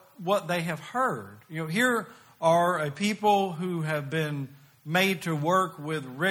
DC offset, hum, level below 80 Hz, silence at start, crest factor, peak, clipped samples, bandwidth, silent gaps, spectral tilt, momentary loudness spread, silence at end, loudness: under 0.1%; none; -70 dBFS; 0.2 s; 18 dB; -10 dBFS; under 0.1%; 17.5 kHz; none; -5 dB/octave; 12 LU; 0 s; -27 LUFS